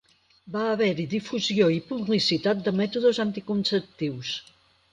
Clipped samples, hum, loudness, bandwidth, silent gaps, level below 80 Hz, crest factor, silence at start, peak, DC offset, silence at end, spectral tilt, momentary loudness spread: under 0.1%; none; -25 LUFS; 9.8 kHz; none; -66 dBFS; 16 dB; 0.45 s; -10 dBFS; under 0.1%; 0.5 s; -5.5 dB/octave; 10 LU